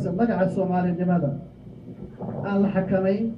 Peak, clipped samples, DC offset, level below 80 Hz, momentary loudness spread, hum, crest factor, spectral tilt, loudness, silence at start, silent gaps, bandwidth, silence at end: -10 dBFS; under 0.1%; under 0.1%; -52 dBFS; 18 LU; none; 14 dB; -10 dB/octave; -24 LUFS; 0 s; none; 5.4 kHz; 0 s